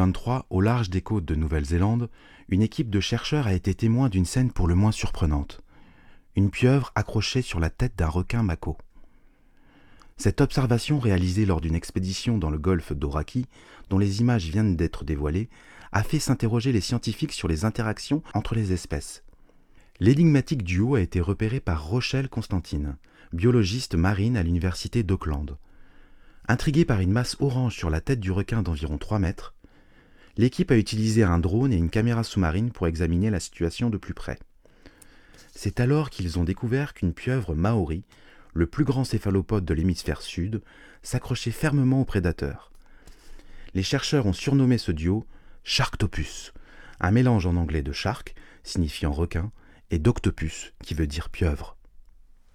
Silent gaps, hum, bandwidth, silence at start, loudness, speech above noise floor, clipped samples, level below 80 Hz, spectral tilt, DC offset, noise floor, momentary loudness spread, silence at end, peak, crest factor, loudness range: none; none; 14.5 kHz; 0 s; -25 LUFS; 31 dB; under 0.1%; -38 dBFS; -6.5 dB/octave; under 0.1%; -55 dBFS; 11 LU; 0.55 s; -6 dBFS; 18 dB; 4 LU